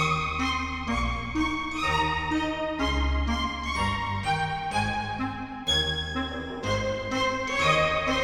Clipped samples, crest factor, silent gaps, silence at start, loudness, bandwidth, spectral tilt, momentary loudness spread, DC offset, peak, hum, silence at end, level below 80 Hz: under 0.1%; 16 dB; none; 0 s; -27 LUFS; 13.5 kHz; -4.5 dB/octave; 6 LU; under 0.1%; -10 dBFS; none; 0 s; -38 dBFS